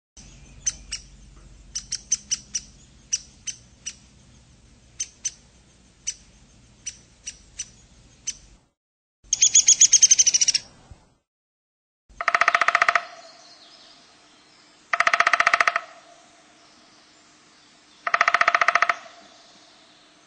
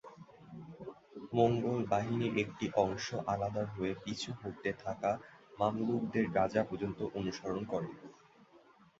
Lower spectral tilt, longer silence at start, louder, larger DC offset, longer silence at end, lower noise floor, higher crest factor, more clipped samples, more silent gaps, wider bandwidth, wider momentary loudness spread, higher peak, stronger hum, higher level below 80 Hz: second, 2 dB/octave vs -5.5 dB/octave; about the same, 0.15 s vs 0.05 s; first, -19 LUFS vs -35 LUFS; neither; first, 1.25 s vs 0.55 s; second, -55 dBFS vs -63 dBFS; about the same, 24 dB vs 22 dB; neither; first, 8.77-9.23 s, 11.27-12.09 s vs none; first, 9.4 kHz vs 7.6 kHz; first, 24 LU vs 19 LU; first, -2 dBFS vs -14 dBFS; neither; first, -56 dBFS vs -64 dBFS